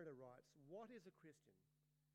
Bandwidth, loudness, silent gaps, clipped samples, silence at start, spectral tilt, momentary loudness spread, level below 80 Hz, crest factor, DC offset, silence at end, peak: 10 kHz; -62 LUFS; none; under 0.1%; 0 s; -6.5 dB/octave; 8 LU; under -90 dBFS; 18 dB; under 0.1%; 0 s; -46 dBFS